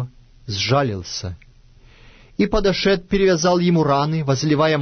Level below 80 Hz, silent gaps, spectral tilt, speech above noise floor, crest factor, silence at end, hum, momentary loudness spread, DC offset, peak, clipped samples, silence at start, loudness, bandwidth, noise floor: -38 dBFS; none; -5.5 dB/octave; 30 dB; 14 dB; 0 s; none; 12 LU; under 0.1%; -6 dBFS; under 0.1%; 0 s; -19 LUFS; 6.6 kHz; -48 dBFS